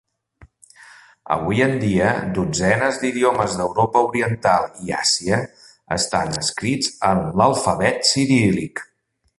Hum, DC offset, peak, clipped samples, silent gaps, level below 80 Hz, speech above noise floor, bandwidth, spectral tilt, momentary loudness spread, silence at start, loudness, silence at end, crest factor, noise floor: none; under 0.1%; -2 dBFS; under 0.1%; none; -46 dBFS; 32 dB; 11.5 kHz; -4 dB/octave; 6 LU; 1.25 s; -19 LUFS; 0.55 s; 18 dB; -51 dBFS